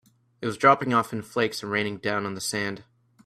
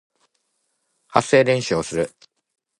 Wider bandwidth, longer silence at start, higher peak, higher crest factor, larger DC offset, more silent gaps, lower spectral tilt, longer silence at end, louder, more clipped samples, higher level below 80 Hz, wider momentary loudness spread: first, 15.5 kHz vs 11.5 kHz; second, 0.4 s vs 1.1 s; second, -4 dBFS vs 0 dBFS; about the same, 22 dB vs 22 dB; neither; neither; about the same, -4.5 dB/octave vs -4.5 dB/octave; second, 0.45 s vs 0.7 s; second, -25 LUFS vs -20 LUFS; neither; second, -66 dBFS vs -56 dBFS; first, 13 LU vs 10 LU